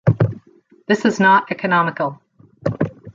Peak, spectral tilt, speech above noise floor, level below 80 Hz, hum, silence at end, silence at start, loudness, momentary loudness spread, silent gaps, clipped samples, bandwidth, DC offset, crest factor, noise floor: -2 dBFS; -7 dB/octave; 35 dB; -50 dBFS; none; 0.05 s; 0.05 s; -18 LUFS; 13 LU; none; under 0.1%; 7.6 kHz; under 0.1%; 16 dB; -51 dBFS